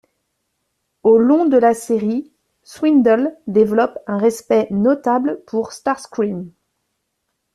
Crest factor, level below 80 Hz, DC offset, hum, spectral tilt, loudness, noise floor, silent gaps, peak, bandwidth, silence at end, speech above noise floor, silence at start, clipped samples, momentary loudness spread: 14 dB; -60 dBFS; under 0.1%; none; -6.5 dB/octave; -17 LUFS; -73 dBFS; none; -2 dBFS; 13.5 kHz; 1.05 s; 57 dB; 1.05 s; under 0.1%; 10 LU